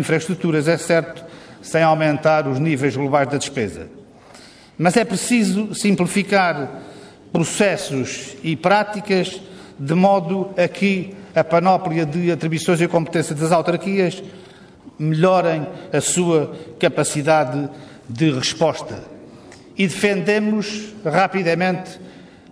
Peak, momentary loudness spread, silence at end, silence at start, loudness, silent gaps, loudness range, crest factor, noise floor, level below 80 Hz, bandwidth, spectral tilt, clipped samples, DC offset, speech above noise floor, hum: -2 dBFS; 15 LU; 0.25 s; 0 s; -19 LUFS; none; 2 LU; 16 dB; -44 dBFS; -58 dBFS; 11 kHz; -5 dB/octave; under 0.1%; under 0.1%; 25 dB; none